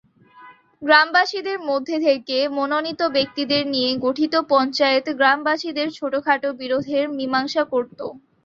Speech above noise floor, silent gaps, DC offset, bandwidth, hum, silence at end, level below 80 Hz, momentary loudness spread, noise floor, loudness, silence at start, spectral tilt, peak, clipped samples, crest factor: 27 dB; none; under 0.1%; 7.4 kHz; none; 0.25 s; -66 dBFS; 8 LU; -47 dBFS; -20 LUFS; 0.35 s; -4 dB/octave; -2 dBFS; under 0.1%; 18 dB